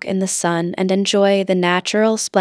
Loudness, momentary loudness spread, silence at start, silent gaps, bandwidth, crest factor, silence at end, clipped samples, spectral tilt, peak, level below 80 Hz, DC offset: -17 LUFS; 5 LU; 0.05 s; none; 11 kHz; 16 dB; 0 s; under 0.1%; -4 dB/octave; 0 dBFS; -68 dBFS; under 0.1%